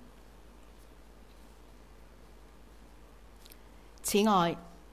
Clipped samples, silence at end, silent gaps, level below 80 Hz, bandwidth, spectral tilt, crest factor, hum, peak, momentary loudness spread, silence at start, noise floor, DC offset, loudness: under 0.1%; 0.25 s; none; -56 dBFS; 16 kHz; -4.5 dB/octave; 22 dB; none; -14 dBFS; 29 LU; 4.05 s; -55 dBFS; 0.1%; -29 LUFS